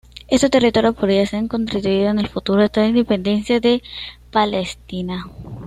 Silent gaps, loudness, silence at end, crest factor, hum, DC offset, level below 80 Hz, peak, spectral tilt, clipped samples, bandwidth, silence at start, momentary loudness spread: none; -18 LUFS; 0 s; 16 dB; none; under 0.1%; -42 dBFS; -2 dBFS; -5.5 dB/octave; under 0.1%; 12 kHz; 0.3 s; 12 LU